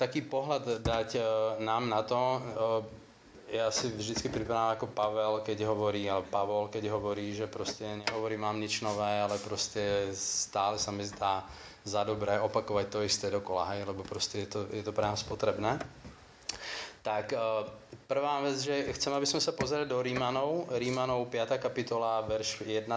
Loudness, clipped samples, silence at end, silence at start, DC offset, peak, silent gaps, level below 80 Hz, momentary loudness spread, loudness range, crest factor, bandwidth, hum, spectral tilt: -33 LUFS; under 0.1%; 0 s; 0 s; under 0.1%; -16 dBFS; none; -58 dBFS; 6 LU; 3 LU; 18 dB; 8 kHz; none; -4 dB/octave